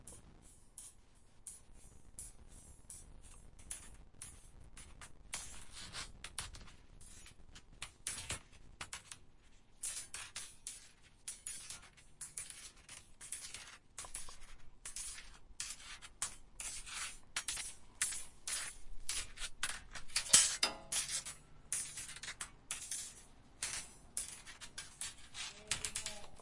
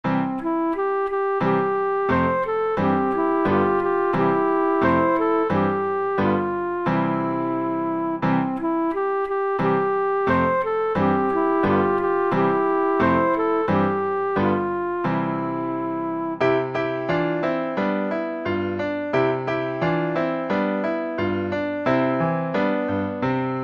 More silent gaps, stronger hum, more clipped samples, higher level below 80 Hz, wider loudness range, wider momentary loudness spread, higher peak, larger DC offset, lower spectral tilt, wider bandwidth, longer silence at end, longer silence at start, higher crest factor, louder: neither; neither; neither; second, -60 dBFS vs -54 dBFS; first, 18 LU vs 3 LU; first, 19 LU vs 5 LU; second, -10 dBFS vs -6 dBFS; neither; second, 0.5 dB/octave vs -9 dB/octave; first, 11.5 kHz vs 6.6 kHz; about the same, 0 s vs 0 s; about the same, 0 s vs 0.05 s; first, 34 dB vs 16 dB; second, -41 LUFS vs -22 LUFS